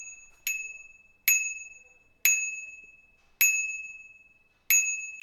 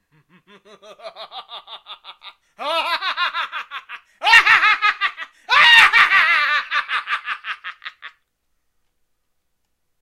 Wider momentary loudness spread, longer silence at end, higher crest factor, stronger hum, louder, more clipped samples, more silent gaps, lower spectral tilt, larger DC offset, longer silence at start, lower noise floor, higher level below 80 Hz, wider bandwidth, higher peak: second, 21 LU vs 26 LU; second, 0 s vs 1.95 s; about the same, 24 dB vs 20 dB; neither; second, -25 LUFS vs -14 LUFS; neither; neither; second, 5 dB/octave vs 1 dB/octave; neither; second, 0 s vs 0.9 s; second, -62 dBFS vs -70 dBFS; second, -70 dBFS vs -60 dBFS; first, 19 kHz vs 16 kHz; second, -8 dBFS vs 0 dBFS